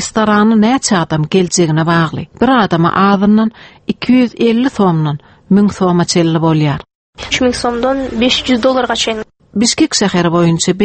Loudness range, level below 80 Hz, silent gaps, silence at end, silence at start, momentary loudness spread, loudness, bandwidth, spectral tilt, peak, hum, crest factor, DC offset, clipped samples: 2 LU; -42 dBFS; 6.95-7.13 s; 0 s; 0 s; 8 LU; -12 LUFS; 8.8 kHz; -5 dB/octave; 0 dBFS; none; 12 dB; under 0.1%; under 0.1%